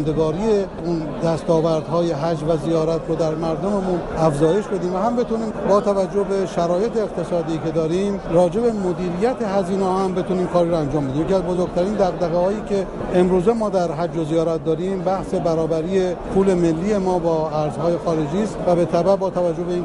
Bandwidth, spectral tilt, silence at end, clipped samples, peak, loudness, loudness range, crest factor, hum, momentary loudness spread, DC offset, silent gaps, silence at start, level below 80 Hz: 11.5 kHz; -7.5 dB/octave; 0 s; under 0.1%; -4 dBFS; -20 LUFS; 1 LU; 14 dB; none; 5 LU; under 0.1%; none; 0 s; -40 dBFS